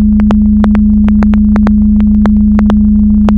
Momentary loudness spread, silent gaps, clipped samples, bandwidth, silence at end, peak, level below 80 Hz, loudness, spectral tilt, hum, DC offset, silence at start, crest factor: 0 LU; none; 0.5%; 4 kHz; 0 s; 0 dBFS; -14 dBFS; -8 LUFS; -10 dB/octave; none; under 0.1%; 0 s; 6 dB